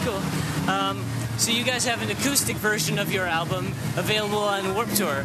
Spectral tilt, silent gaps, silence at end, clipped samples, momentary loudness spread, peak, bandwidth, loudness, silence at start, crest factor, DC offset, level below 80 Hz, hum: -3.5 dB/octave; none; 0 s; under 0.1%; 6 LU; -6 dBFS; 13.5 kHz; -24 LUFS; 0 s; 18 dB; under 0.1%; -50 dBFS; none